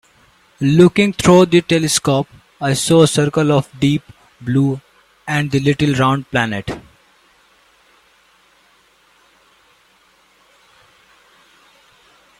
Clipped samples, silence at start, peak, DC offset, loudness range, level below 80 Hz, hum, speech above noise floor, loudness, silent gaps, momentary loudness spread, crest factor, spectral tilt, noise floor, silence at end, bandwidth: under 0.1%; 0.6 s; 0 dBFS; under 0.1%; 9 LU; -48 dBFS; none; 40 dB; -15 LUFS; none; 14 LU; 18 dB; -5.5 dB/octave; -54 dBFS; 5.6 s; 14.5 kHz